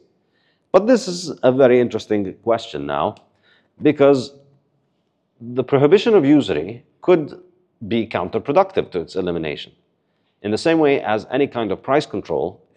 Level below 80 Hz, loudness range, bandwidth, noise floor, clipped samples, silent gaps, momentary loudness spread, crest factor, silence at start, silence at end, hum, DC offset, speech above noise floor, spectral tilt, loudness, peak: -60 dBFS; 4 LU; 10 kHz; -68 dBFS; under 0.1%; none; 12 LU; 20 dB; 0.75 s; 0.25 s; none; under 0.1%; 50 dB; -6.5 dB/octave; -18 LUFS; 0 dBFS